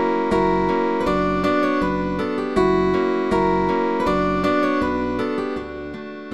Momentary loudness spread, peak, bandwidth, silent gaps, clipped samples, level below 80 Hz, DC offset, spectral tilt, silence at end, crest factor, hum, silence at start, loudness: 7 LU; -6 dBFS; 11.5 kHz; none; under 0.1%; -40 dBFS; 0.8%; -7 dB/octave; 0 s; 14 dB; none; 0 s; -20 LUFS